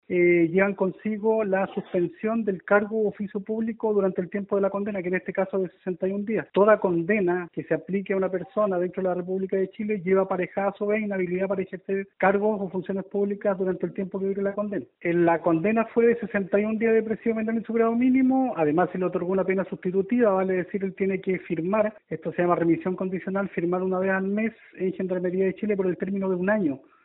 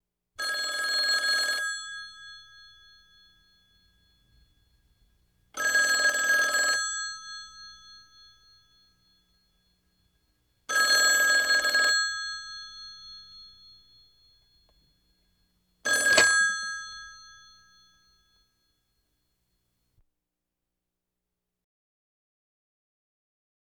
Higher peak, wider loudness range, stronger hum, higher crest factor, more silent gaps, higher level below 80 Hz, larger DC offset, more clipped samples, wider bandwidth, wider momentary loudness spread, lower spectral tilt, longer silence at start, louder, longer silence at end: about the same, -6 dBFS vs -6 dBFS; second, 3 LU vs 16 LU; neither; second, 18 dB vs 24 dB; neither; about the same, -66 dBFS vs -70 dBFS; neither; neither; second, 4 kHz vs 19 kHz; second, 8 LU vs 25 LU; first, -7.5 dB/octave vs 2 dB/octave; second, 0.1 s vs 0.4 s; about the same, -25 LUFS vs -24 LUFS; second, 0.25 s vs 6.4 s